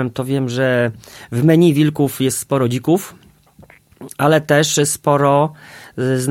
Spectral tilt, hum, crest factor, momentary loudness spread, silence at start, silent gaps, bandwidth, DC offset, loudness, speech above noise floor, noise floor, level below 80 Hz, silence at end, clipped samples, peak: -5.5 dB/octave; none; 16 dB; 10 LU; 0 s; none; 17 kHz; under 0.1%; -16 LUFS; 31 dB; -47 dBFS; -56 dBFS; 0 s; under 0.1%; 0 dBFS